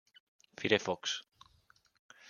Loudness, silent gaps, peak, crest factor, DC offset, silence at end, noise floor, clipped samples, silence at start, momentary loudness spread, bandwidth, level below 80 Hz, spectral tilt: -34 LUFS; 1.99-2.09 s; -10 dBFS; 28 dB; under 0.1%; 0 s; -69 dBFS; under 0.1%; 0.6 s; 11 LU; 7.4 kHz; -78 dBFS; -3 dB/octave